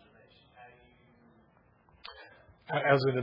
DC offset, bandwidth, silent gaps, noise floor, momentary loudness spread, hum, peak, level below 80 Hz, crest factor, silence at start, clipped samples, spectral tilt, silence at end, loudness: under 0.1%; 5.6 kHz; none; -65 dBFS; 29 LU; none; -10 dBFS; -72 dBFS; 24 dB; 0.6 s; under 0.1%; -4.5 dB/octave; 0 s; -28 LUFS